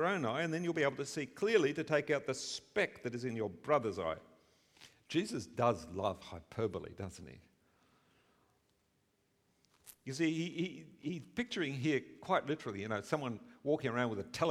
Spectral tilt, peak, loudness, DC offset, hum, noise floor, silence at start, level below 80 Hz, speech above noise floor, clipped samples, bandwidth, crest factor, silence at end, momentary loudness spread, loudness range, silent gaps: -5 dB/octave; -16 dBFS; -37 LUFS; under 0.1%; none; -77 dBFS; 0 s; -70 dBFS; 41 dB; under 0.1%; 15 kHz; 20 dB; 0 s; 11 LU; 11 LU; none